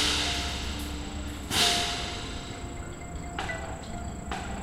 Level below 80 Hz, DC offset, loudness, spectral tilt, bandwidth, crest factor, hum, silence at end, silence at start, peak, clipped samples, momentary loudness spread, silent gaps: -40 dBFS; under 0.1%; -30 LUFS; -2.5 dB/octave; 16 kHz; 20 dB; none; 0 s; 0 s; -10 dBFS; under 0.1%; 15 LU; none